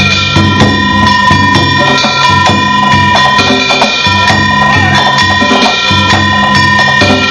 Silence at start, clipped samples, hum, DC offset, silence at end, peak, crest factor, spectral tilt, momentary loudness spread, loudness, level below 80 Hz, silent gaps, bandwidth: 0 s; 3%; none; 0.4%; 0 s; 0 dBFS; 8 dB; -4 dB/octave; 1 LU; -6 LUFS; -32 dBFS; none; 12 kHz